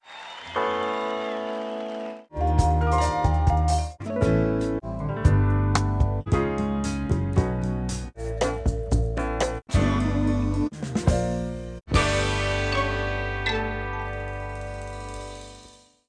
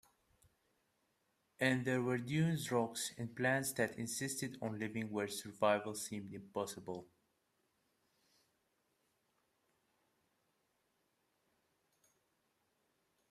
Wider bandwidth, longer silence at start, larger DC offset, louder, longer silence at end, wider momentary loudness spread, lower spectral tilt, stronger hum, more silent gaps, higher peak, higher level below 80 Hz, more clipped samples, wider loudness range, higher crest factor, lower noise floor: second, 10.5 kHz vs 15.5 kHz; second, 0.05 s vs 1.6 s; neither; first, -25 LUFS vs -39 LUFS; second, 0.4 s vs 6.25 s; first, 12 LU vs 9 LU; first, -6 dB/octave vs -4.5 dB/octave; neither; neither; first, -6 dBFS vs -18 dBFS; first, -30 dBFS vs -78 dBFS; neither; second, 3 LU vs 13 LU; about the same, 20 dB vs 24 dB; second, -51 dBFS vs -81 dBFS